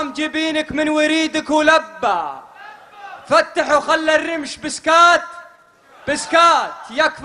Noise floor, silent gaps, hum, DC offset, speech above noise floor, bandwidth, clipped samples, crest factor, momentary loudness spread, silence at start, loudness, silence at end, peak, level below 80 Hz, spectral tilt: -48 dBFS; none; none; under 0.1%; 32 dB; 11 kHz; under 0.1%; 18 dB; 13 LU; 0 s; -16 LUFS; 0 s; 0 dBFS; -54 dBFS; -2 dB/octave